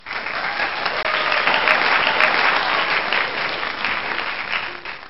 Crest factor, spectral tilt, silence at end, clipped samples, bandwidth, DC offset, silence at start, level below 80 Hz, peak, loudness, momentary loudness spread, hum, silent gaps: 20 dB; 1.5 dB/octave; 0 s; under 0.1%; 6.2 kHz; 1%; 0 s; -54 dBFS; 0 dBFS; -19 LUFS; 8 LU; none; none